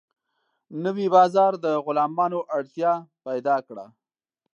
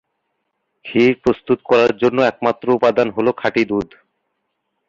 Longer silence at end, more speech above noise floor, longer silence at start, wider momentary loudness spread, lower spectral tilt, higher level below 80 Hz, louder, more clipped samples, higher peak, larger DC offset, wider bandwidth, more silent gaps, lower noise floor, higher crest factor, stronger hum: second, 0.7 s vs 1.05 s; first, 60 dB vs 56 dB; second, 0.7 s vs 0.85 s; first, 13 LU vs 7 LU; about the same, -7 dB/octave vs -6.5 dB/octave; second, -82 dBFS vs -52 dBFS; second, -23 LUFS vs -17 LUFS; neither; about the same, -4 dBFS vs -2 dBFS; neither; about the same, 7.4 kHz vs 7.4 kHz; neither; first, -83 dBFS vs -73 dBFS; about the same, 20 dB vs 16 dB; neither